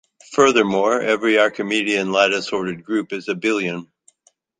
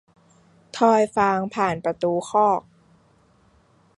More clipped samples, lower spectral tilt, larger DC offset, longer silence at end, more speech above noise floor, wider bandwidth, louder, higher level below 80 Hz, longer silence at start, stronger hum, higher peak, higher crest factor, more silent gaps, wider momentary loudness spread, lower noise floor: neither; second, -4 dB/octave vs -5.5 dB/octave; neither; second, 0.75 s vs 1.4 s; first, 43 dB vs 38 dB; second, 9.6 kHz vs 11.5 kHz; about the same, -19 LUFS vs -21 LUFS; about the same, -62 dBFS vs -60 dBFS; second, 0.3 s vs 0.75 s; neither; about the same, -2 dBFS vs -4 dBFS; about the same, 18 dB vs 20 dB; neither; first, 10 LU vs 6 LU; about the same, -61 dBFS vs -59 dBFS